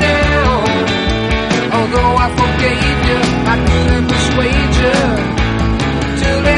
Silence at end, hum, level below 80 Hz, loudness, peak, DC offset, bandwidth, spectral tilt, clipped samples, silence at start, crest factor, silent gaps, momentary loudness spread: 0 s; none; -20 dBFS; -13 LUFS; 0 dBFS; under 0.1%; 11 kHz; -5.5 dB/octave; under 0.1%; 0 s; 12 dB; none; 3 LU